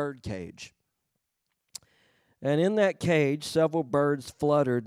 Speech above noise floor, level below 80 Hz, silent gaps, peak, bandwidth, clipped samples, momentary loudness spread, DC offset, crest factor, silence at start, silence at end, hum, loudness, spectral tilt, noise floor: 54 dB; -64 dBFS; none; -12 dBFS; over 20 kHz; under 0.1%; 21 LU; under 0.1%; 16 dB; 0 s; 0 s; none; -27 LUFS; -6 dB/octave; -81 dBFS